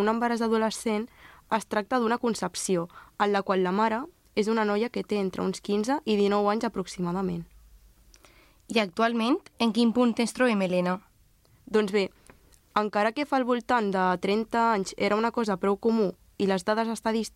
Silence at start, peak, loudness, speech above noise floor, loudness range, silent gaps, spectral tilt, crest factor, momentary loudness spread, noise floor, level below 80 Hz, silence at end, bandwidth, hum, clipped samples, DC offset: 0 s; -10 dBFS; -27 LUFS; 35 dB; 3 LU; none; -5 dB/octave; 18 dB; 6 LU; -61 dBFS; -60 dBFS; 0.05 s; 15 kHz; none; under 0.1%; under 0.1%